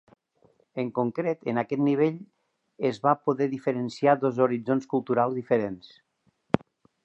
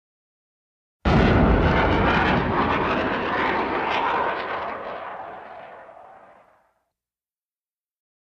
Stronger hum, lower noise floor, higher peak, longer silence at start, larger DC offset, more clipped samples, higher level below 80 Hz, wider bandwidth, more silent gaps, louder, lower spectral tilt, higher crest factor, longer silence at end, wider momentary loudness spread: neither; second, -64 dBFS vs under -90 dBFS; first, -2 dBFS vs -6 dBFS; second, 0.75 s vs 1.05 s; neither; neither; second, -66 dBFS vs -32 dBFS; about the same, 8.2 kHz vs 7.6 kHz; neither; second, -26 LUFS vs -21 LUFS; about the same, -8 dB/octave vs -7.5 dB/octave; first, 24 dB vs 18 dB; second, 0.5 s vs 2.3 s; second, 7 LU vs 18 LU